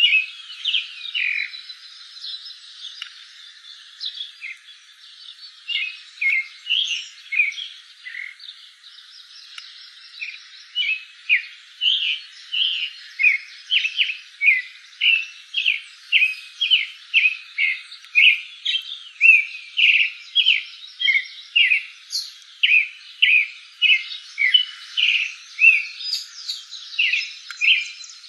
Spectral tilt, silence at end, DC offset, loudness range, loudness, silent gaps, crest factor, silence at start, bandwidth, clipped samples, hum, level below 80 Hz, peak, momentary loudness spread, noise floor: 13 dB/octave; 0 s; under 0.1%; 13 LU; -18 LUFS; none; 20 dB; 0 s; 12.5 kHz; under 0.1%; none; under -90 dBFS; -2 dBFS; 21 LU; -46 dBFS